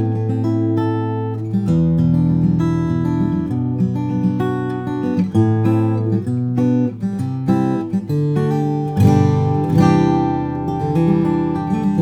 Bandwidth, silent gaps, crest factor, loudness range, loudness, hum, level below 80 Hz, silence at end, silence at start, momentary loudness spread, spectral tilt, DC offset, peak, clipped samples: 9.6 kHz; none; 16 dB; 2 LU; -18 LUFS; none; -42 dBFS; 0 s; 0 s; 7 LU; -9.5 dB/octave; under 0.1%; 0 dBFS; under 0.1%